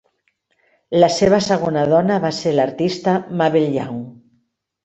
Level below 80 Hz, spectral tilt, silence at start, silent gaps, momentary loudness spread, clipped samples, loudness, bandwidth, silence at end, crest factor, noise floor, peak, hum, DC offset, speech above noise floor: -54 dBFS; -6 dB/octave; 0.9 s; none; 8 LU; under 0.1%; -17 LUFS; 8.2 kHz; 0.7 s; 16 dB; -67 dBFS; -2 dBFS; none; under 0.1%; 50 dB